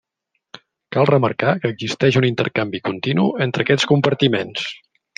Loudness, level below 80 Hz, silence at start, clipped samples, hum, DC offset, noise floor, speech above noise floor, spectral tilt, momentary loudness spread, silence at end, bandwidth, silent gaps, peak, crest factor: -18 LUFS; -60 dBFS; 0.9 s; under 0.1%; none; under 0.1%; -75 dBFS; 57 dB; -6 dB/octave; 8 LU; 0.4 s; 9.4 kHz; none; -2 dBFS; 18 dB